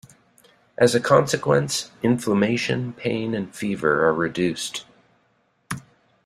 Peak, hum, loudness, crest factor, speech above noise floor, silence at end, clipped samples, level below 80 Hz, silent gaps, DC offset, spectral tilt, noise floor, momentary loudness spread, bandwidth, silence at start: -2 dBFS; none; -22 LUFS; 20 dB; 44 dB; 0.45 s; under 0.1%; -58 dBFS; none; under 0.1%; -5 dB/octave; -65 dBFS; 16 LU; 15.5 kHz; 0.8 s